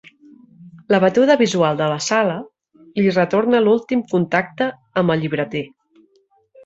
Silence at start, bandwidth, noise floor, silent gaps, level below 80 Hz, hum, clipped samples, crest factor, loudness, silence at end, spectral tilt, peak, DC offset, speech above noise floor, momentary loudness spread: 0.6 s; 8 kHz; -60 dBFS; none; -62 dBFS; none; under 0.1%; 18 dB; -18 LUFS; 1 s; -5.5 dB/octave; -2 dBFS; under 0.1%; 43 dB; 10 LU